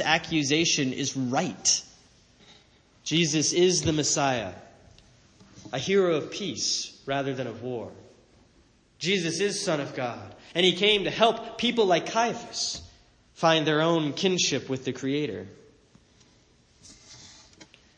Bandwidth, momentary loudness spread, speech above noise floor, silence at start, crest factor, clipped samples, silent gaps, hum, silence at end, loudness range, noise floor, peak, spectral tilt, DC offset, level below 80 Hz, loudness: 10 kHz; 13 LU; 35 dB; 0 s; 22 dB; under 0.1%; none; none; 0.35 s; 6 LU; -61 dBFS; -6 dBFS; -3 dB/octave; under 0.1%; -62 dBFS; -25 LUFS